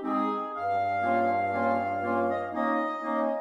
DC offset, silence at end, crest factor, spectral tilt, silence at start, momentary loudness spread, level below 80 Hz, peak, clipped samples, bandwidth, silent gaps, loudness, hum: under 0.1%; 0 s; 12 dB; -7.5 dB/octave; 0 s; 4 LU; -76 dBFS; -16 dBFS; under 0.1%; 8.2 kHz; none; -28 LUFS; none